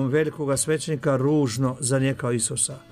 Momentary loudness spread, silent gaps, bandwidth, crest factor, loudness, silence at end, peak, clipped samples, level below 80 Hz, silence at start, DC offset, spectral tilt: 3 LU; none; 15.5 kHz; 16 dB; -23 LUFS; 0.15 s; -8 dBFS; under 0.1%; -56 dBFS; 0 s; under 0.1%; -5 dB/octave